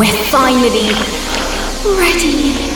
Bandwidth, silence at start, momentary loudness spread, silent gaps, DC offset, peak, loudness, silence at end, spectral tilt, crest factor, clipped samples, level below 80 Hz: over 20 kHz; 0 s; 6 LU; none; under 0.1%; 0 dBFS; -13 LUFS; 0 s; -3 dB/octave; 12 dB; under 0.1%; -24 dBFS